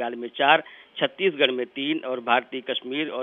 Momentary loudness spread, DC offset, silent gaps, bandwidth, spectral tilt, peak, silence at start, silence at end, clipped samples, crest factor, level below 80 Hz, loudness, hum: 10 LU; under 0.1%; none; 4 kHz; -6.5 dB/octave; -4 dBFS; 0 s; 0 s; under 0.1%; 22 dB; -84 dBFS; -24 LUFS; none